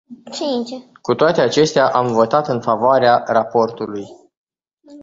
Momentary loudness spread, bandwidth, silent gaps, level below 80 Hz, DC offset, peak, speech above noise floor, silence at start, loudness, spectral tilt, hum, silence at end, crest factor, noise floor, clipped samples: 15 LU; 8 kHz; 4.37-4.47 s; -58 dBFS; under 0.1%; -2 dBFS; 32 dB; 0.1 s; -16 LUFS; -5 dB/octave; none; 0 s; 16 dB; -48 dBFS; under 0.1%